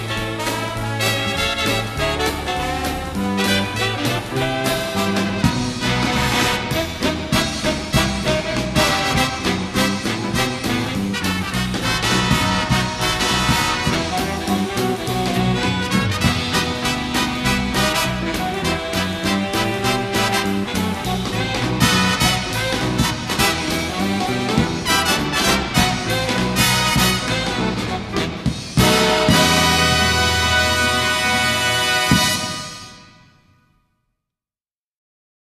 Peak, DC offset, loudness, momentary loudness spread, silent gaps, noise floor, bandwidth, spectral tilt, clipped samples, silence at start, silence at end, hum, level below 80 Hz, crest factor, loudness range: 0 dBFS; under 0.1%; -18 LUFS; 7 LU; none; under -90 dBFS; 14 kHz; -3.5 dB/octave; under 0.1%; 0 s; 2.45 s; none; -34 dBFS; 18 dB; 5 LU